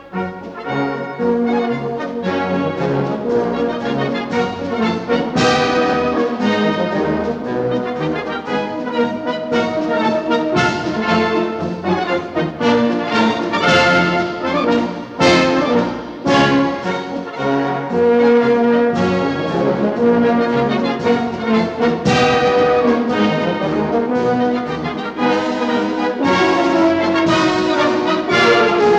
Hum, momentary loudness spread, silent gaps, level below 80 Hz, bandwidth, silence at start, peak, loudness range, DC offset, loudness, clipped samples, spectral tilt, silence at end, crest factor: none; 8 LU; none; -50 dBFS; 9 kHz; 0 s; -2 dBFS; 4 LU; under 0.1%; -16 LUFS; under 0.1%; -5.5 dB/octave; 0 s; 14 dB